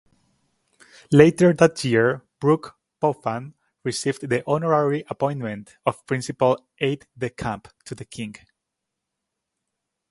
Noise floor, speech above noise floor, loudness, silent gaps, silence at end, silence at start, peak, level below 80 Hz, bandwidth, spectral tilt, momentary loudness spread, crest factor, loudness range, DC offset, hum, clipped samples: -82 dBFS; 61 dB; -22 LUFS; none; 1.8 s; 1.1 s; 0 dBFS; -58 dBFS; 11.5 kHz; -6 dB/octave; 18 LU; 22 dB; 8 LU; under 0.1%; none; under 0.1%